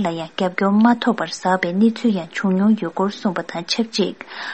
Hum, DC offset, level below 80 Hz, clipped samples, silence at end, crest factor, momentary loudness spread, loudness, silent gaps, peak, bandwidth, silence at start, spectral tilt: none; 0.2%; -66 dBFS; under 0.1%; 0 s; 18 dB; 8 LU; -19 LUFS; none; -2 dBFS; 8.6 kHz; 0 s; -5.5 dB/octave